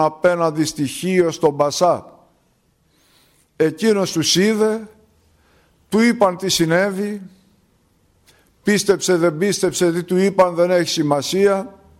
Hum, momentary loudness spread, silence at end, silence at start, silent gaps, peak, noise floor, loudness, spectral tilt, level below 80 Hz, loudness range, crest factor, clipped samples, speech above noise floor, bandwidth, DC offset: none; 7 LU; 0.3 s; 0 s; none; -2 dBFS; -61 dBFS; -18 LUFS; -4.5 dB/octave; -56 dBFS; 3 LU; 16 dB; under 0.1%; 44 dB; 16 kHz; under 0.1%